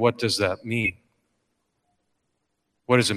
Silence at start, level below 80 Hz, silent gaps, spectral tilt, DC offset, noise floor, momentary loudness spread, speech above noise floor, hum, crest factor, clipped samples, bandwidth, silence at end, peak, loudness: 0 s; -60 dBFS; none; -4.5 dB/octave; under 0.1%; -76 dBFS; 5 LU; 53 dB; none; 20 dB; under 0.1%; 15 kHz; 0 s; -6 dBFS; -24 LUFS